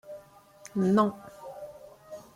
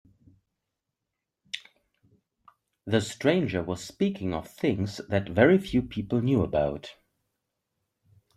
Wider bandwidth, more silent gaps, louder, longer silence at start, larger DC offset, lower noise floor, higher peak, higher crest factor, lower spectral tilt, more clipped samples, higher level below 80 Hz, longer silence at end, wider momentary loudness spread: about the same, 15 kHz vs 14 kHz; neither; about the same, -27 LUFS vs -27 LUFS; second, 0.05 s vs 1.55 s; neither; second, -53 dBFS vs -85 dBFS; second, -12 dBFS vs -6 dBFS; about the same, 20 dB vs 24 dB; about the same, -7.5 dB/octave vs -6.5 dB/octave; neither; second, -68 dBFS vs -54 dBFS; second, 0.15 s vs 1.45 s; first, 24 LU vs 18 LU